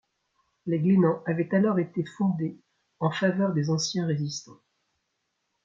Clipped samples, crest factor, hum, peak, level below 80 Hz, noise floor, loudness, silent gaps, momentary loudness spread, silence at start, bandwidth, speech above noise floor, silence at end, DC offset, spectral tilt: under 0.1%; 18 dB; none; -10 dBFS; -70 dBFS; -78 dBFS; -26 LUFS; none; 10 LU; 0.65 s; 7.6 kHz; 53 dB; 1.1 s; under 0.1%; -6 dB/octave